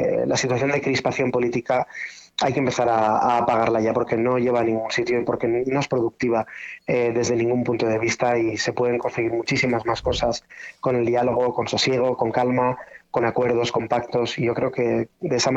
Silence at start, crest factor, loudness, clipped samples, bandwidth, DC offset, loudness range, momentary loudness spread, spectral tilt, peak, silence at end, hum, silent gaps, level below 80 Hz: 0 s; 16 dB; -22 LUFS; under 0.1%; 8.2 kHz; under 0.1%; 2 LU; 5 LU; -5 dB/octave; -6 dBFS; 0 s; none; none; -50 dBFS